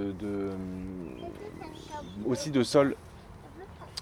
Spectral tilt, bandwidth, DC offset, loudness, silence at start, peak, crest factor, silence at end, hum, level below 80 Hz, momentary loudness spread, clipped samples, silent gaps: -5.5 dB/octave; 16 kHz; under 0.1%; -32 LUFS; 0 s; -10 dBFS; 22 dB; 0 s; none; -54 dBFS; 22 LU; under 0.1%; none